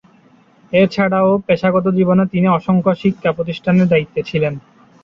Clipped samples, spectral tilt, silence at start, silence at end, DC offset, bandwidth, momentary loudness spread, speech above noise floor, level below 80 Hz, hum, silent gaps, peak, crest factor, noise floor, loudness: under 0.1%; -8.5 dB/octave; 0.7 s; 0.45 s; under 0.1%; 6.4 kHz; 6 LU; 35 dB; -50 dBFS; none; none; -2 dBFS; 14 dB; -50 dBFS; -15 LUFS